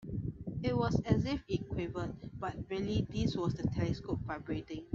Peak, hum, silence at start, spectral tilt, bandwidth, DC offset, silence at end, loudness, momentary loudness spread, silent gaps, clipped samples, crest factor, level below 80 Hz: -16 dBFS; none; 0 s; -7.5 dB/octave; 7.6 kHz; under 0.1%; 0 s; -36 LUFS; 9 LU; none; under 0.1%; 20 dB; -50 dBFS